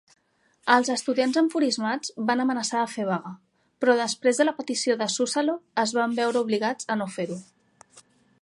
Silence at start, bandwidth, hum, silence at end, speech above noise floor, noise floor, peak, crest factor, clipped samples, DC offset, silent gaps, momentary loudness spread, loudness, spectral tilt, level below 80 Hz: 0.65 s; 11.5 kHz; none; 0.4 s; 41 dB; -65 dBFS; -2 dBFS; 22 dB; under 0.1%; under 0.1%; none; 7 LU; -25 LUFS; -3.5 dB/octave; -78 dBFS